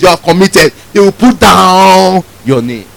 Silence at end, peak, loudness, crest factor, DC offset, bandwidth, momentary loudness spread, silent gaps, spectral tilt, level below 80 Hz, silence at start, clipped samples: 0.15 s; 0 dBFS; -6 LUFS; 6 dB; under 0.1%; over 20 kHz; 9 LU; none; -4.5 dB/octave; -32 dBFS; 0 s; 5%